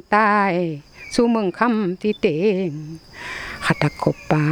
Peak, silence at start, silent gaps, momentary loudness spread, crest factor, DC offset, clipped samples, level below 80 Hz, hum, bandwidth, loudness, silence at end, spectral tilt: 0 dBFS; 0.1 s; none; 15 LU; 20 dB; under 0.1%; under 0.1%; -50 dBFS; none; 13 kHz; -20 LUFS; 0 s; -6.5 dB/octave